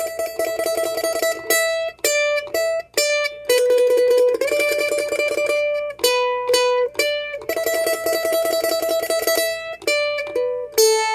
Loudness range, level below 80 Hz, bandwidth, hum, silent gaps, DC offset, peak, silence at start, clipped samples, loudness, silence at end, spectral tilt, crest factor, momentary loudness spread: 2 LU; -60 dBFS; 16 kHz; none; none; under 0.1%; -2 dBFS; 0 s; under 0.1%; -19 LUFS; 0 s; 0 dB/octave; 18 dB; 7 LU